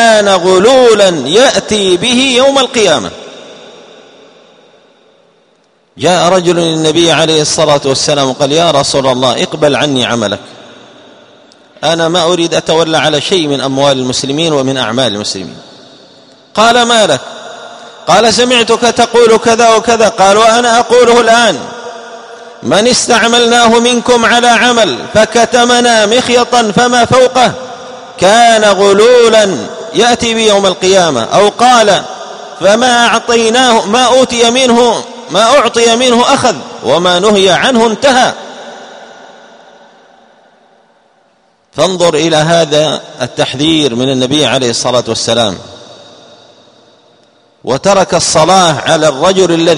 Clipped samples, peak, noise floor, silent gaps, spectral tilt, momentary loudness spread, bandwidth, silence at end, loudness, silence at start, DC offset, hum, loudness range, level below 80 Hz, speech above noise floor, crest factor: 0.8%; 0 dBFS; -51 dBFS; none; -3 dB/octave; 11 LU; 12.5 kHz; 0 s; -8 LUFS; 0 s; under 0.1%; none; 6 LU; -46 dBFS; 43 dB; 10 dB